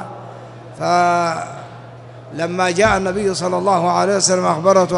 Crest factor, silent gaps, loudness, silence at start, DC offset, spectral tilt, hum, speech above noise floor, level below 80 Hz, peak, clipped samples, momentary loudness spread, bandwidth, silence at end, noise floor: 16 dB; none; -16 LUFS; 0 s; under 0.1%; -4 dB/octave; none; 21 dB; -46 dBFS; -2 dBFS; under 0.1%; 22 LU; 11.5 kHz; 0 s; -36 dBFS